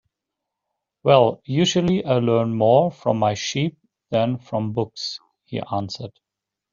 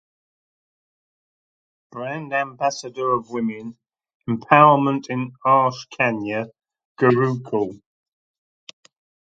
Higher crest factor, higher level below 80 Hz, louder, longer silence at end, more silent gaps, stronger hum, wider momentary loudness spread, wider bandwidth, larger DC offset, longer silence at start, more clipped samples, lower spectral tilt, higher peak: about the same, 20 dB vs 22 dB; first, -58 dBFS vs -66 dBFS; about the same, -21 LUFS vs -20 LUFS; second, 0.65 s vs 1.45 s; second, none vs 4.15-4.20 s, 6.85-6.95 s; neither; second, 14 LU vs 17 LU; second, 7.6 kHz vs 8.4 kHz; neither; second, 1.05 s vs 1.95 s; neither; about the same, -5.5 dB/octave vs -6.5 dB/octave; about the same, -2 dBFS vs 0 dBFS